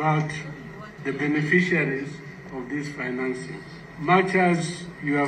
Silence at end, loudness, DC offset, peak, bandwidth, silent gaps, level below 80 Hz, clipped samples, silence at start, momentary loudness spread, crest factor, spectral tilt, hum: 0 s; -24 LUFS; under 0.1%; -6 dBFS; 9.6 kHz; none; -58 dBFS; under 0.1%; 0 s; 18 LU; 18 dB; -6.5 dB/octave; none